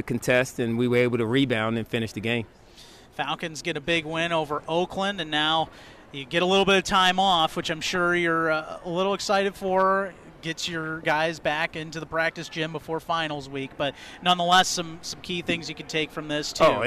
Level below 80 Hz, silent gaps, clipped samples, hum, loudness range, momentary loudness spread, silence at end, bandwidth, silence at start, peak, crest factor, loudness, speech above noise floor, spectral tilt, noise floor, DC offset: -54 dBFS; none; under 0.1%; none; 5 LU; 11 LU; 0 s; 15.5 kHz; 0 s; -10 dBFS; 14 dB; -25 LUFS; 24 dB; -4 dB/octave; -49 dBFS; under 0.1%